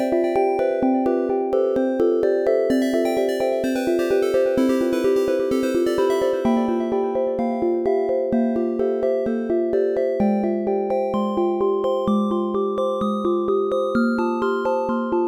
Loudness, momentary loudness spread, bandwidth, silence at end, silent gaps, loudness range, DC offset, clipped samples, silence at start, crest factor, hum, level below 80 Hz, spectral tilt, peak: -21 LUFS; 3 LU; 18 kHz; 0 s; none; 1 LU; under 0.1%; under 0.1%; 0 s; 12 dB; none; -54 dBFS; -6.5 dB/octave; -8 dBFS